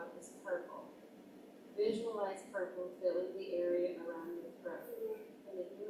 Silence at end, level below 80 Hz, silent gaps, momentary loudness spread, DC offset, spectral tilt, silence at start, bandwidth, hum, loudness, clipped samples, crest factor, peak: 0 s; -86 dBFS; none; 18 LU; under 0.1%; -5 dB/octave; 0 s; 16 kHz; none; -41 LUFS; under 0.1%; 18 dB; -24 dBFS